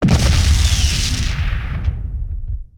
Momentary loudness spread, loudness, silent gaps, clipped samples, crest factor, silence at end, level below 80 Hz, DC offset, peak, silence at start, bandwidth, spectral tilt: 13 LU; -18 LUFS; none; under 0.1%; 14 dB; 0.15 s; -18 dBFS; 0.2%; -2 dBFS; 0 s; 18 kHz; -4.5 dB/octave